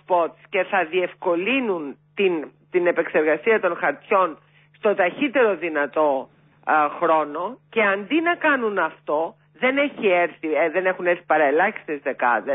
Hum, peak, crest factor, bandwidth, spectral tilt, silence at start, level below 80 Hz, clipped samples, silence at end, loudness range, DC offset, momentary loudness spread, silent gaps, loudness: none; -6 dBFS; 14 dB; 3.9 kHz; -9.5 dB/octave; 0.1 s; -76 dBFS; under 0.1%; 0 s; 1 LU; under 0.1%; 7 LU; none; -21 LUFS